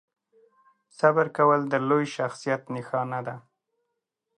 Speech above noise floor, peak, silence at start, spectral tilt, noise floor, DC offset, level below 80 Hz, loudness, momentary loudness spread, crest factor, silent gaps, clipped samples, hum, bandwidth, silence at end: 57 dB; -6 dBFS; 1 s; -6.5 dB/octave; -81 dBFS; under 0.1%; -78 dBFS; -25 LUFS; 11 LU; 20 dB; none; under 0.1%; none; 10.5 kHz; 1 s